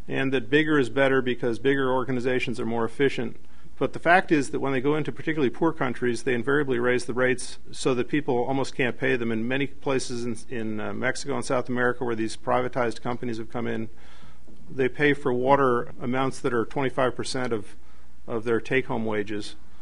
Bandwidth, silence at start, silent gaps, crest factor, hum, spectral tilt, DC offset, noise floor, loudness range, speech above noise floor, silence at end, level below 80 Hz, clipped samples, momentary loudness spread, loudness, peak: 10.5 kHz; 0.1 s; none; 22 dB; none; -5.5 dB/octave; 4%; -50 dBFS; 4 LU; 25 dB; 0.25 s; -52 dBFS; under 0.1%; 10 LU; -26 LUFS; -4 dBFS